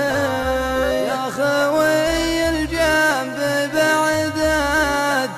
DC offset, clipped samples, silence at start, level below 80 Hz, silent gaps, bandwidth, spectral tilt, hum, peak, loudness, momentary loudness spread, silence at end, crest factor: under 0.1%; under 0.1%; 0 s; -36 dBFS; none; 15 kHz; -4 dB/octave; none; -6 dBFS; -18 LUFS; 4 LU; 0 s; 12 dB